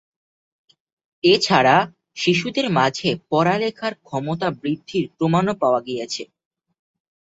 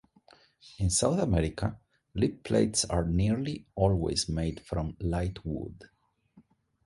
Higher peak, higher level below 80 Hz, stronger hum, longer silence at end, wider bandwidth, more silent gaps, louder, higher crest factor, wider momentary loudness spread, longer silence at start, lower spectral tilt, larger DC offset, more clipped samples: first, -2 dBFS vs -10 dBFS; second, -60 dBFS vs -42 dBFS; neither; first, 1 s vs 0.45 s; second, 8 kHz vs 11.5 kHz; neither; first, -20 LUFS vs -30 LUFS; about the same, 20 dB vs 20 dB; first, 13 LU vs 10 LU; first, 1.25 s vs 0.65 s; about the same, -5 dB/octave vs -5 dB/octave; neither; neither